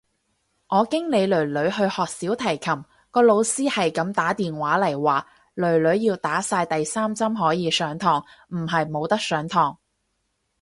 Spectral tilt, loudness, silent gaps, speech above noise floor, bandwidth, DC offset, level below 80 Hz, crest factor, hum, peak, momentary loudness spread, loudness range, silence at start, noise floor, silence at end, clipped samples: -4.5 dB/octave; -22 LUFS; none; 51 dB; 11.5 kHz; under 0.1%; -62 dBFS; 18 dB; none; -6 dBFS; 6 LU; 2 LU; 0.7 s; -73 dBFS; 0.9 s; under 0.1%